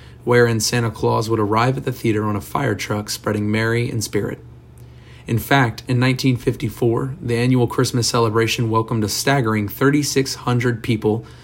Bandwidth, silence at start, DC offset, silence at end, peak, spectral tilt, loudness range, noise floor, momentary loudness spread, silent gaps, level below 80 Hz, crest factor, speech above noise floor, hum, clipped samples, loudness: 16.5 kHz; 0 s; under 0.1%; 0.05 s; 0 dBFS; -5 dB/octave; 4 LU; -41 dBFS; 6 LU; none; -46 dBFS; 18 dB; 23 dB; none; under 0.1%; -19 LUFS